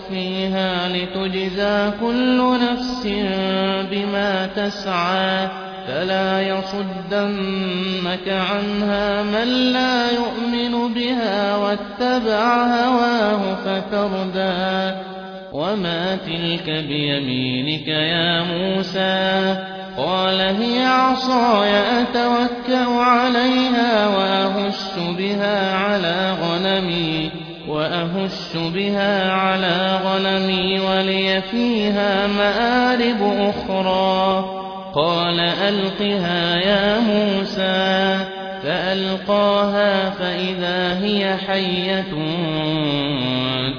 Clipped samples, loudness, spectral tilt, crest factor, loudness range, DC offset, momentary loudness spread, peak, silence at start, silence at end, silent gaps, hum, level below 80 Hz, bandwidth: under 0.1%; -19 LUFS; -6 dB/octave; 16 dB; 4 LU; under 0.1%; 6 LU; -4 dBFS; 0 s; 0 s; none; none; -50 dBFS; 5.4 kHz